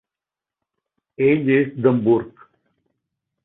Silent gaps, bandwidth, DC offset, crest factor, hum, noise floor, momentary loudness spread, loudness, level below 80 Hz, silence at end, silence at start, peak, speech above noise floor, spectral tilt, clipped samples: none; 4 kHz; under 0.1%; 18 dB; none; -89 dBFS; 5 LU; -18 LUFS; -62 dBFS; 1.15 s; 1.2 s; -4 dBFS; 71 dB; -12.5 dB/octave; under 0.1%